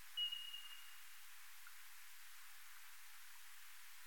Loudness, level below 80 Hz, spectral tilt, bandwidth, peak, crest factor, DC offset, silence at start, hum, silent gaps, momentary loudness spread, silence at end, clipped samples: -52 LUFS; -90 dBFS; 3 dB/octave; 17 kHz; -34 dBFS; 20 dB; 0.2%; 0 s; none; none; 15 LU; 0 s; under 0.1%